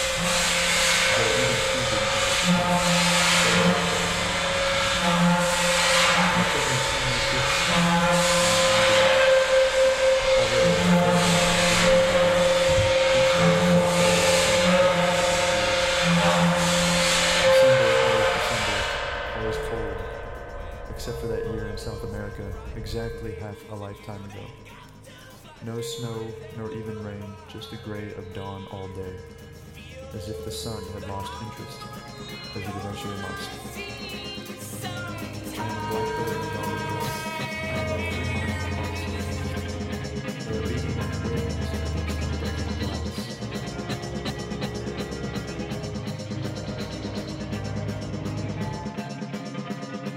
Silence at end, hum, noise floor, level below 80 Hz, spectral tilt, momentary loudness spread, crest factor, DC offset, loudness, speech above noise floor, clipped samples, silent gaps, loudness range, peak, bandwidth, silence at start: 0 s; none; -45 dBFS; -40 dBFS; -3.5 dB/octave; 18 LU; 16 dB; under 0.1%; -23 LUFS; 12 dB; under 0.1%; none; 17 LU; -8 dBFS; 16 kHz; 0 s